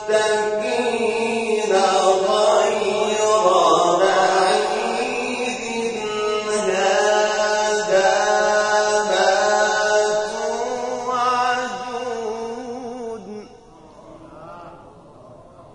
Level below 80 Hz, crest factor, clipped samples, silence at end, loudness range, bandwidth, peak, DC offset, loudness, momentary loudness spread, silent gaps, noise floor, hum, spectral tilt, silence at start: -56 dBFS; 16 dB; under 0.1%; 0.1 s; 11 LU; 11 kHz; -2 dBFS; under 0.1%; -19 LUFS; 13 LU; none; -45 dBFS; none; -2 dB/octave; 0 s